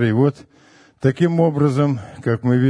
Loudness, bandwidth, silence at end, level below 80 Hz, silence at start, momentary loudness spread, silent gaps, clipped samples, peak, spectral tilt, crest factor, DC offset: -19 LUFS; 10 kHz; 0 s; -56 dBFS; 0 s; 5 LU; none; under 0.1%; -2 dBFS; -9 dB/octave; 16 dB; under 0.1%